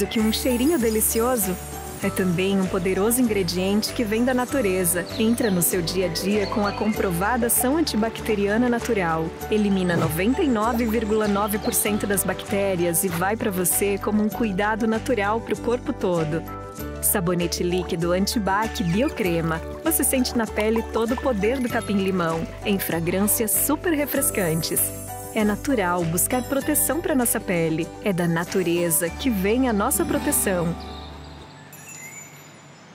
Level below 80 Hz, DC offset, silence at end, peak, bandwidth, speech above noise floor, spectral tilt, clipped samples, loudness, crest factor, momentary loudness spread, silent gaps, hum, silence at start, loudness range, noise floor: -40 dBFS; under 0.1%; 0 s; -8 dBFS; 16.5 kHz; 23 dB; -4.5 dB/octave; under 0.1%; -22 LUFS; 16 dB; 6 LU; none; none; 0 s; 2 LU; -45 dBFS